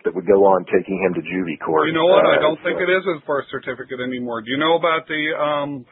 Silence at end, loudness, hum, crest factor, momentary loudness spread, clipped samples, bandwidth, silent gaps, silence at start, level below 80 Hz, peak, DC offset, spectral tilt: 0.1 s; -19 LUFS; none; 18 dB; 12 LU; under 0.1%; 4.1 kHz; none; 0.05 s; -60 dBFS; 0 dBFS; under 0.1%; -10.5 dB/octave